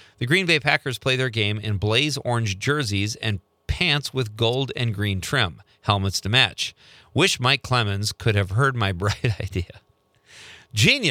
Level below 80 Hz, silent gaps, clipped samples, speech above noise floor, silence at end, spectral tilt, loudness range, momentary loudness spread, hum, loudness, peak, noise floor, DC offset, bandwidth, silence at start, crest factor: -46 dBFS; none; under 0.1%; 33 dB; 0 s; -4 dB/octave; 3 LU; 10 LU; none; -22 LUFS; -2 dBFS; -55 dBFS; under 0.1%; 15.5 kHz; 0.2 s; 22 dB